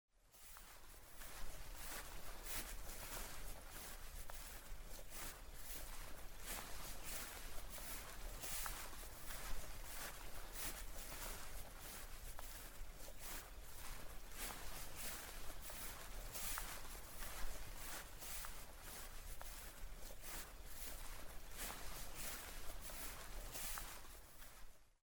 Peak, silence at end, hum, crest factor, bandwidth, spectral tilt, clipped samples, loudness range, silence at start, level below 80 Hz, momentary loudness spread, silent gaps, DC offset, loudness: -28 dBFS; 0.15 s; none; 20 dB; over 20 kHz; -2 dB/octave; under 0.1%; 3 LU; 0.25 s; -54 dBFS; 9 LU; none; under 0.1%; -51 LUFS